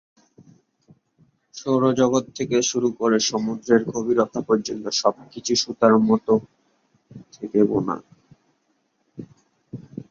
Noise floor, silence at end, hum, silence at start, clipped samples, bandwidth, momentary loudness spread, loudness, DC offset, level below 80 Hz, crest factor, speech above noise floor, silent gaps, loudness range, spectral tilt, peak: -69 dBFS; 0.3 s; none; 1.55 s; under 0.1%; 7.6 kHz; 19 LU; -21 LUFS; under 0.1%; -62 dBFS; 20 dB; 48 dB; none; 7 LU; -4.5 dB/octave; -2 dBFS